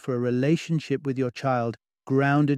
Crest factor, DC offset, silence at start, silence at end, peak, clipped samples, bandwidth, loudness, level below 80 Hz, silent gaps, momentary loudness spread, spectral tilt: 14 dB; under 0.1%; 0.05 s; 0 s; -10 dBFS; under 0.1%; 10 kHz; -25 LUFS; -68 dBFS; none; 6 LU; -7.5 dB/octave